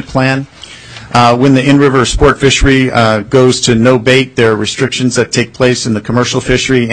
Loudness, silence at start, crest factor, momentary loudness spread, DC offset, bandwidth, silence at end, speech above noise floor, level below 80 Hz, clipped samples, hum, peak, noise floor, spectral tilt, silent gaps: -9 LUFS; 0 s; 10 dB; 6 LU; under 0.1%; 10.5 kHz; 0 s; 21 dB; -26 dBFS; 0.2%; none; 0 dBFS; -30 dBFS; -5 dB/octave; none